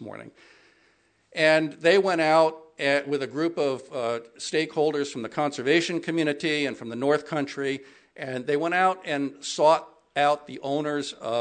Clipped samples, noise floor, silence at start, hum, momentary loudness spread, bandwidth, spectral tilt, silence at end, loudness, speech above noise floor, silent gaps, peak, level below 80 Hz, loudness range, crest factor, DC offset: under 0.1%; -65 dBFS; 0 s; none; 10 LU; 9.4 kHz; -4.5 dB/octave; 0 s; -25 LUFS; 40 dB; none; -6 dBFS; -78 dBFS; 3 LU; 20 dB; under 0.1%